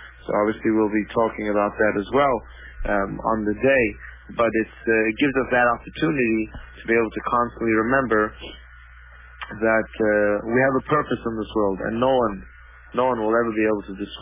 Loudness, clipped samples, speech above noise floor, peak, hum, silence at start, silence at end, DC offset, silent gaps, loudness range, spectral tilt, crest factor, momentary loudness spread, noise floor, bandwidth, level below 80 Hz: -22 LUFS; under 0.1%; 23 dB; -6 dBFS; none; 0 s; 0 s; under 0.1%; none; 2 LU; -10 dB/octave; 16 dB; 9 LU; -45 dBFS; 3.8 kHz; -44 dBFS